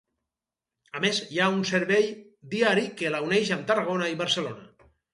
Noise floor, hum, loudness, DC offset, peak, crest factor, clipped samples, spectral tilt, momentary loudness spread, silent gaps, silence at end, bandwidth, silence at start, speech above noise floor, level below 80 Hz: -89 dBFS; none; -26 LUFS; under 0.1%; -8 dBFS; 20 dB; under 0.1%; -4 dB/octave; 11 LU; none; 0.5 s; 11.5 kHz; 0.95 s; 64 dB; -70 dBFS